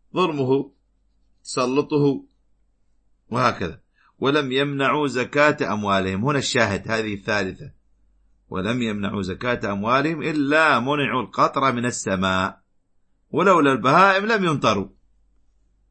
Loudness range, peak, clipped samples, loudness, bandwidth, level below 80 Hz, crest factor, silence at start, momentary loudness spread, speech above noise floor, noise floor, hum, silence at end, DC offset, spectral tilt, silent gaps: 6 LU; -2 dBFS; under 0.1%; -21 LUFS; 8.8 kHz; -56 dBFS; 20 dB; 0.15 s; 11 LU; 42 dB; -63 dBFS; none; 1 s; under 0.1%; -5 dB/octave; none